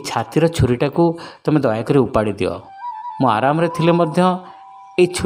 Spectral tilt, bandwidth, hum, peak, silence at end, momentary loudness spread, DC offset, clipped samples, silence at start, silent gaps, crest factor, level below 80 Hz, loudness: -6.5 dB/octave; 16 kHz; none; -2 dBFS; 0 s; 10 LU; under 0.1%; under 0.1%; 0 s; none; 16 dB; -42 dBFS; -18 LUFS